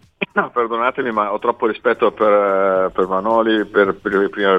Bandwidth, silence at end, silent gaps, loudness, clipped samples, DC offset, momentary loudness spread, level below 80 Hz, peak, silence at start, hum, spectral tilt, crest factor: 5.6 kHz; 0 s; none; -17 LUFS; under 0.1%; under 0.1%; 5 LU; -54 dBFS; -2 dBFS; 0.2 s; none; -7 dB/octave; 16 dB